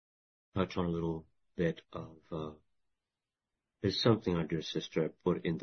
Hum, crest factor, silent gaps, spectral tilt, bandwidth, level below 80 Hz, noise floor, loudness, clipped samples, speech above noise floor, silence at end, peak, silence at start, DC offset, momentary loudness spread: none; 24 dB; none; -5.5 dB/octave; 6.4 kHz; -60 dBFS; under -90 dBFS; -35 LUFS; under 0.1%; over 56 dB; 0 s; -12 dBFS; 0.55 s; under 0.1%; 15 LU